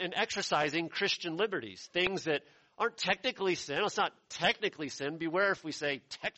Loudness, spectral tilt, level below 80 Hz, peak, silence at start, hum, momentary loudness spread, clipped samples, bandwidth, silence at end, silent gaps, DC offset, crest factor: -33 LUFS; -3 dB/octave; -70 dBFS; -12 dBFS; 0 s; none; 6 LU; under 0.1%; 8.2 kHz; 0.05 s; none; under 0.1%; 22 dB